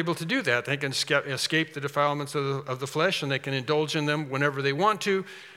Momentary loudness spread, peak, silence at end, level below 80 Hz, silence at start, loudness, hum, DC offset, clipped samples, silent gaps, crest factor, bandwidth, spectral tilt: 5 LU; -8 dBFS; 0 s; -78 dBFS; 0 s; -26 LUFS; none; under 0.1%; under 0.1%; none; 20 dB; 16.5 kHz; -4.5 dB/octave